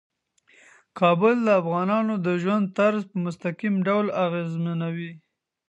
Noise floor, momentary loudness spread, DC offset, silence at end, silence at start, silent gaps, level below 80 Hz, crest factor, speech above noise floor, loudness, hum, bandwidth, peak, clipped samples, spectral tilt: -60 dBFS; 10 LU; under 0.1%; 0.55 s; 0.95 s; none; -76 dBFS; 18 dB; 37 dB; -24 LUFS; none; 8.2 kHz; -6 dBFS; under 0.1%; -8 dB/octave